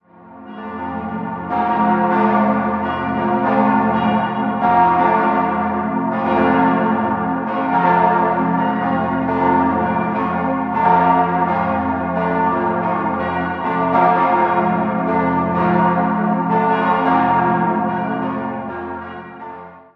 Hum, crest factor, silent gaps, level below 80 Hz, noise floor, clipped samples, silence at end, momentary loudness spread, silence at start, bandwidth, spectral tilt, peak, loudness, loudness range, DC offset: none; 16 dB; none; -44 dBFS; -39 dBFS; under 0.1%; 0.15 s; 11 LU; 0.2 s; 5.4 kHz; -9.5 dB/octave; -2 dBFS; -17 LUFS; 2 LU; under 0.1%